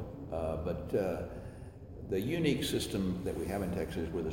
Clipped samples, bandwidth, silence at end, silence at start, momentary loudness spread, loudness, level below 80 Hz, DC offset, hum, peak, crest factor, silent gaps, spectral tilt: under 0.1%; 16 kHz; 0 s; 0 s; 15 LU; -35 LUFS; -50 dBFS; under 0.1%; none; -16 dBFS; 18 dB; none; -6 dB/octave